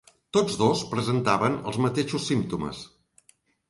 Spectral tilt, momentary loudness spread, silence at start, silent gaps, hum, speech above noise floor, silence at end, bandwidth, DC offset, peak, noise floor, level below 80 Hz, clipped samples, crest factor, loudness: -5.5 dB/octave; 10 LU; 0.35 s; none; none; 38 dB; 0.8 s; 11.5 kHz; under 0.1%; -8 dBFS; -63 dBFS; -56 dBFS; under 0.1%; 20 dB; -26 LUFS